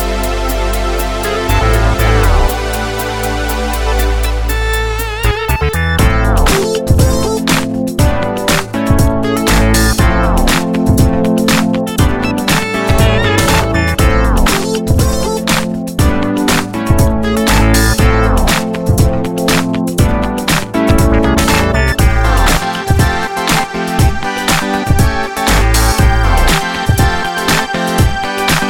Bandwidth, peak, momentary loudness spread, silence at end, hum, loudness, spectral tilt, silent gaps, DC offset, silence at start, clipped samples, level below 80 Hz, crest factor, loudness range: 17.5 kHz; 0 dBFS; 5 LU; 0 s; none; -13 LUFS; -5 dB/octave; none; under 0.1%; 0 s; under 0.1%; -16 dBFS; 12 dB; 2 LU